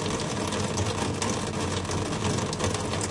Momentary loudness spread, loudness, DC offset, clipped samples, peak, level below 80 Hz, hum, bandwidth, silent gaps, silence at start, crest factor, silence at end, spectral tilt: 1 LU; -28 LUFS; under 0.1%; under 0.1%; -10 dBFS; -48 dBFS; none; 11.5 kHz; none; 0 s; 18 dB; 0 s; -4 dB/octave